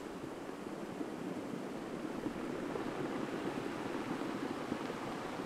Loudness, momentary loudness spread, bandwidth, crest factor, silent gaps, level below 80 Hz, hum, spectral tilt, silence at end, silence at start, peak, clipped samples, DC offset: -41 LUFS; 5 LU; 16 kHz; 16 dB; none; -68 dBFS; none; -5.5 dB/octave; 0 s; 0 s; -24 dBFS; under 0.1%; under 0.1%